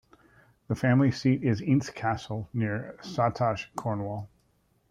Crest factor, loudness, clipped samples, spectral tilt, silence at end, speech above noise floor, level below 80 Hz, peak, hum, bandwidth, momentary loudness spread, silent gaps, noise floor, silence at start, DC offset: 18 dB; -28 LUFS; under 0.1%; -7.5 dB/octave; 0.65 s; 41 dB; -60 dBFS; -12 dBFS; none; 10.5 kHz; 12 LU; none; -69 dBFS; 0.7 s; under 0.1%